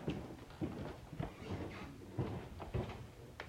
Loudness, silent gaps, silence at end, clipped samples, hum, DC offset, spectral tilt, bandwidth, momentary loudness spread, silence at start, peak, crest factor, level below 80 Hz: -46 LUFS; none; 0 s; under 0.1%; none; under 0.1%; -7 dB/octave; 16 kHz; 7 LU; 0 s; -28 dBFS; 18 dB; -56 dBFS